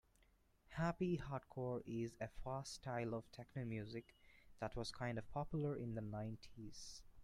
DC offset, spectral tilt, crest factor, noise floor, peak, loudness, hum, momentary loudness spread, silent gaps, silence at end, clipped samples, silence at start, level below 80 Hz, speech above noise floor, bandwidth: under 0.1%; -6.5 dB/octave; 20 dB; -75 dBFS; -28 dBFS; -47 LUFS; none; 11 LU; none; 0 s; under 0.1%; 0.7 s; -64 dBFS; 29 dB; 14 kHz